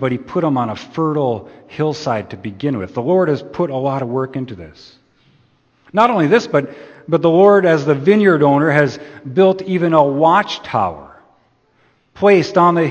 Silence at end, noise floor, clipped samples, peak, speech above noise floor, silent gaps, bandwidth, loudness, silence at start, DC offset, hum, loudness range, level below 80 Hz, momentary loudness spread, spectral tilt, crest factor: 0 s; -57 dBFS; under 0.1%; 0 dBFS; 42 dB; none; 8.2 kHz; -15 LUFS; 0 s; under 0.1%; none; 7 LU; -56 dBFS; 12 LU; -7 dB/octave; 16 dB